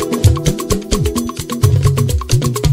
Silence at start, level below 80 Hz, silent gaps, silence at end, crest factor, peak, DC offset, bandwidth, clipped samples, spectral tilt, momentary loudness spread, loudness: 0 s; -22 dBFS; none; 0 s; 14 dB; 0 dBFS; under 0.1%; 16.5 kHz; under 0.1%; -5.5 dB/octave; 6 LU; -15 LUFS